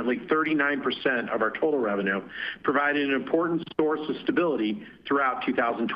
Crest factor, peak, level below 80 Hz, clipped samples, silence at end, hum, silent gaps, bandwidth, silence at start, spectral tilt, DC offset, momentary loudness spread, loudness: 18 dB; -8 dBFS; -66 dBFS; under 0.1%; 0 s; none; none; 5.4 kHz; 0 s; -8 dB/octave; under 0.1%; 5 LU; -26 LUFS